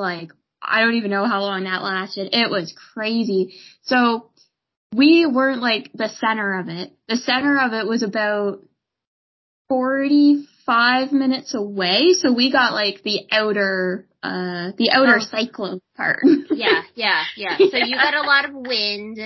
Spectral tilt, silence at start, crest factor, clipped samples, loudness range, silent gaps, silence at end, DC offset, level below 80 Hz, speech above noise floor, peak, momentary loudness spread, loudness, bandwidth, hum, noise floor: -4 dB/octave; 0 s; 18 dB; under 0.1%; 4 LU; 4.77-4.90 s, 9.07-9.65 s; 0 s; under 0.1%; -68 dBFS; over 71 dB; -2 dBFS; 12 LU; -19 LUFS; 6.2 kHz; none; under -90 dBFS